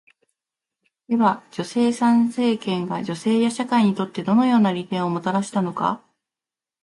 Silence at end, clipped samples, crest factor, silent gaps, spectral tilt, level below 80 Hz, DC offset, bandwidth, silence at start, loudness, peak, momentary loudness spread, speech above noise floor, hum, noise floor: 0.85 s; under 0.1%; 16 dB; none; -6 dB/octave; -68 dBFS; under 0.1%; 11.5 kHz; 1.1 s; -21 LUFS; -6 dBFS; 8 LU; 70 dB; none; -90 dBFS